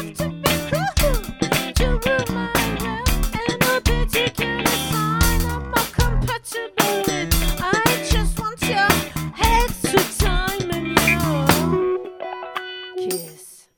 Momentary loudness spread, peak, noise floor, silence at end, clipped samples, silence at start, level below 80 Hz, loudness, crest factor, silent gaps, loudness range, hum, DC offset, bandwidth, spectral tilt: 9 LU; 0 dBFS; -43 dBFS; 0.2 s; under 0.1%; 0 s; -26 dBFS; -20 LUFS; 20 dB; none; 2 LU; none; under 0.1%; 17.5 kHz; -4 dB/octave